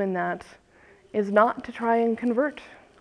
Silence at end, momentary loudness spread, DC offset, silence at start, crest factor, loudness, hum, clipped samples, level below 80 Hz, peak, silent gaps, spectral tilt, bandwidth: 0.3 s; 10 LU; under 0.1%; 0 s; 20 dB; -25 LUFS; none; under 0.1%; -64 dBFS; -6 dBFS; none; -7.5 dB/octave; 10 kHz